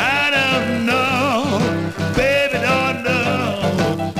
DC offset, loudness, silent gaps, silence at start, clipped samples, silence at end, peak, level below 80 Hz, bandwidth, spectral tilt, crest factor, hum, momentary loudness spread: 0.2%; -17 LUFS; none; 0 s; under 0.1%; 0 s; -6 dBFS; -42 dBFS; 15.5 kHz; -5 dB/octave; 12 dB; none; 5 LU